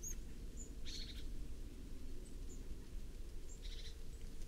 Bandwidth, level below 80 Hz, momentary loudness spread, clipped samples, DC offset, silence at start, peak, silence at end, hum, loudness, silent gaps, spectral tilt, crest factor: 15.5 kHz; -48 dBFS; 6 LU; under 0.1%; under 0.1%; 0 s; -34 dBFS; 0 s; none; -53 LUFS; none; -3.5 dB/octave; 12 dB